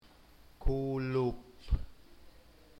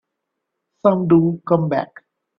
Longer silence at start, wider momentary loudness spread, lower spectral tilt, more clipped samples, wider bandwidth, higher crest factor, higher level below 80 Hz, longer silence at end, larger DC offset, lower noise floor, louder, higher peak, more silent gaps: second, 0.6 s vs 0.85 s; first, 13 LU vs 9 LU; second, -8.5 dB/octave vs -11.5 dB/octave; neither; first, 13.5 kHz vs 5.2 kHz; about the same, 18 dB vs 18 dB; first, -40 dBFS vs -60 dBFS; about the same, 0.5 s vs 0.55 s; neither; second, -59 dBFS vs -78 dBFS; second, -36 LUFS vs -18 LUFS; second, -18 dBFS vs -2 dBFS; neither